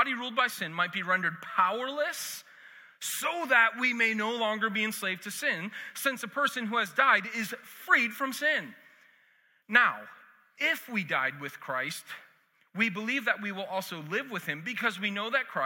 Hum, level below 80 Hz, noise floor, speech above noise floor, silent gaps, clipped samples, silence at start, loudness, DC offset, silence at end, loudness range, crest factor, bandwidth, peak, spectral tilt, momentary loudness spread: none; under -90 dBFS; -66 dBFS; 36 dB; none; under 0.1%; 0 s; -29 LUFS; under 0.1%; 0 s; 4 LU; 24 dB; 17 kHz; -8 dBFS; -2.5 dB/octave; 12 LU